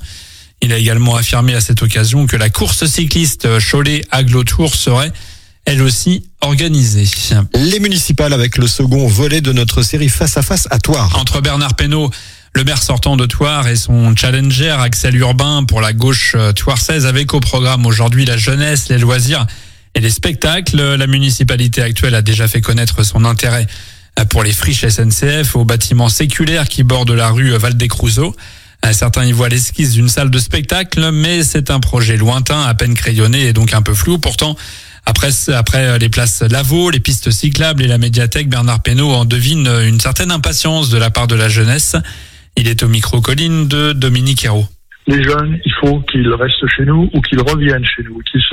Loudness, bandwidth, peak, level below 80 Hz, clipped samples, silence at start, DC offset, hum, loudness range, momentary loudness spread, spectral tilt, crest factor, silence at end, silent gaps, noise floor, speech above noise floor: -11 LUFS; 16.5 kHz; 0 dBFS; -24 dBFS; under 0.1%; 0 s; under 0.1%; none; 1 LU; 4 LU; -4.5 dB/octave; 10 dB; 0 s; none; -35 dBFS; 24 dB